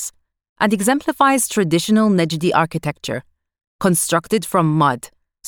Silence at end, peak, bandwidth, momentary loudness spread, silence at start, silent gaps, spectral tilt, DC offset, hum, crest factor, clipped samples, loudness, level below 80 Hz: 0 s; 0 dBFS; 20 kHz; 11 LU; 0 s; 0.49-0.56 s, 3.67-3.79 s; -4.5 dB/octave; under 0.1%; none; 18 dB; under 0.1%; -17 LUFS; -56 dBFS